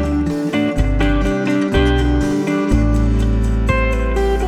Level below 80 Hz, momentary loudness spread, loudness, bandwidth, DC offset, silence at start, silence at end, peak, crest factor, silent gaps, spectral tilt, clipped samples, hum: -18 dBFS; 3 LU; -17 LUFS; 11 kHz; under 0.1%; 0 s; 0 s; -2 dBFS; 14 dB; none; -7 dB/octave; under 0.1%; none